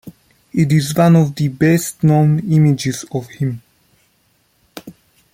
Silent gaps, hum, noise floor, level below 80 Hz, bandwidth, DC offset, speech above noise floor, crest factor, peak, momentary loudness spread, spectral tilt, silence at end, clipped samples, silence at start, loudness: none; none; -60 dBFS; -52 dBFS; 16 kHz; under 0.1%; 46 dB; 14 dB; -2 dBFS; 17 LU; -6.5 dB/octave; 0.45 s; under 0.1%; 0.05 s; -15 LUFS